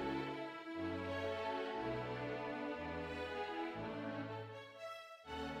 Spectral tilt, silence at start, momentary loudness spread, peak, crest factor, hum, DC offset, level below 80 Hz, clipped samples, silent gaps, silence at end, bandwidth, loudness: -6 dB/octave; 0 s; 8 LU; -28 dBFS; 14 dB; none; under 0.1%; -66 dBFS; under 0.1%; none; 0 s; 15.5 kHz; -44 LUFS